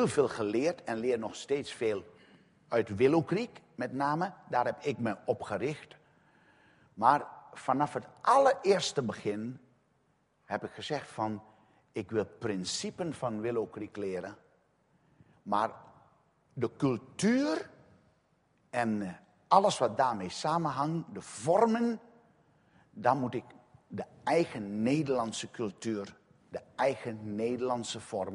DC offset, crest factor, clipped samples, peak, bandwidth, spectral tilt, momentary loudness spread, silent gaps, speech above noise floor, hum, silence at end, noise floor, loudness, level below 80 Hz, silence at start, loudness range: under 0.1%; 26 dB; under 0.1%; -8 dBFS; 10.5 kHz; -5.5 dB/octave; 14 LU; none; 41 dB; none; 0 s; -72 dBFS; -32 LUFS; -72 dBFS; 0 s; 7 LU